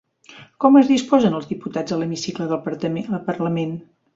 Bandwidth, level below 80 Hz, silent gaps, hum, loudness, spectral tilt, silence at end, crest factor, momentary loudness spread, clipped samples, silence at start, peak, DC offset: 7.8 kHz; -60 dBFS; none; none; -20 LUFS; -6.5 dB/octave; 0.35 s; 18 dB; 13 LU; under 0.1%; 0.3 s; -2 dBFS; under 0.1%